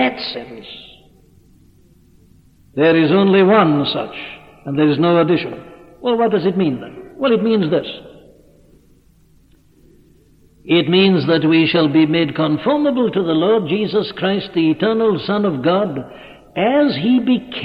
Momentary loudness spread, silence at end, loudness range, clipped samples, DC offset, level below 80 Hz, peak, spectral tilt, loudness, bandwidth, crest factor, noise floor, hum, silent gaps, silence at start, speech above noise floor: 17 LU; 0 s; 7 LU; under 0.1%; under 0.1%; -54 dBFS; 0 dBFS; -8.5 dB/octave; -16 LUFS; 5.4 kHz; 16 dB; -51 dBFS; none; none; 0 s; 36 dB